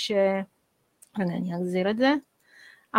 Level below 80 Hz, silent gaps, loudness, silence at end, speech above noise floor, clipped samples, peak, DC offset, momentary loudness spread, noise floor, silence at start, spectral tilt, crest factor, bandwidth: -70 dBFS; none; -26 LUFS; 0 s; 36 dB; under 0.1%; -6 dBFS; under 0.1%; 10 LU; -61 dBFS; 0 s; -6 dB/octave; 20 dB; 15 kHz